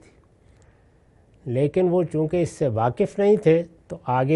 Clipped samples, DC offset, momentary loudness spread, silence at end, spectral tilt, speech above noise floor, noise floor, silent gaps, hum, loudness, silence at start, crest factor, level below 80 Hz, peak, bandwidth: under 0.1%; under 0.1%; 11 LU; 0 s; -8 dB/octave; 36 dB; -56 dBFS; none; none; -22 LUFS; 1.45 s; 18 dB; -54 dBFS; -4 dBFS; 11.5 kHz